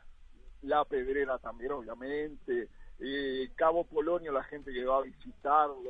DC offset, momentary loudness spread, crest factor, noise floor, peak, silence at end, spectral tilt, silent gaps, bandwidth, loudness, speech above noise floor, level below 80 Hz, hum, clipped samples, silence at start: under 0.1%; 11 LU; 20 dB; -52 dBFS; -14 dBFS; 0 s; -7 dB/octave; none; 4.8 kHz; -33 LUFS; 20 dB; -54 dBFS; none; under 0.1%; 0.05 s